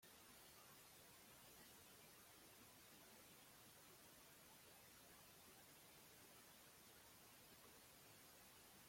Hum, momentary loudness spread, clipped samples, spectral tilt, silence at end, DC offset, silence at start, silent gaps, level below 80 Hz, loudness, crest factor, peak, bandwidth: none; 1 LU; under 0.1%; -2 dB/octave; 0 s; under 0.1%; 0 s; none; -86 dBFS; -65 LUFS; 14 dB; -52 dBFS; 16.5 kHz